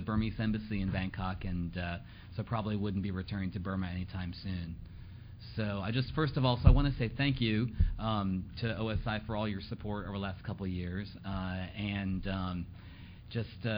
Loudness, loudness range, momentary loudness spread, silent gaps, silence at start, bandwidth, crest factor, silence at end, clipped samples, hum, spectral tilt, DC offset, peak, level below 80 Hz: -35 LUFS; 7 LU; 12 LU; none; 0 s; 5.4 kHz; 26 dB; 0 s; under 0.1%; none; -10.5 dB/octave; under 0.1%; -8 dBFS; -40 dBFS